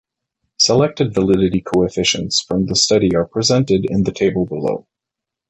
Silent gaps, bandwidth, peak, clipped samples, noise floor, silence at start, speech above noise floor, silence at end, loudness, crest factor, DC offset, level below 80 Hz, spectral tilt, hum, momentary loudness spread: none; 9 kHz; -2 dBFS; under 0.1%; -84 dBFS; 0.6 s; 68 dB; 0.7 s; -16 LUFS; 16 dB; under 0.1%; -42 dBFS; -4.5 dB/octave; none; 6 LU